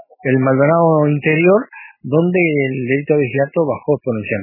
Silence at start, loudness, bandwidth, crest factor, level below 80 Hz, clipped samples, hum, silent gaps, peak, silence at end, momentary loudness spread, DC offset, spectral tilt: 0.25 s; -15 LUFS; 3.1 kHz; 14 dB; -62 dBFS; under 0.1%; none; none; 0 dBFS; 0 s; 6 LU; under 0.1%; -12 dB/octave